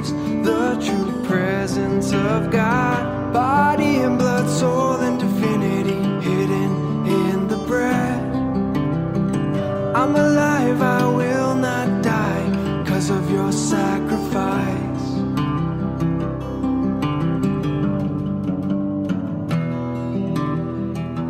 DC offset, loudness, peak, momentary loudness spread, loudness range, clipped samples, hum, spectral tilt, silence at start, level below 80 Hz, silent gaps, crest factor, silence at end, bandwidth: under 0.1%; -20 LUFS; -6 dBFS; 6 LU; 4 LU; under 0.1%; none; -6.5 dB/octave; 0 s; -42 dBFS; none; 14 dB; 0 s; 16 kHz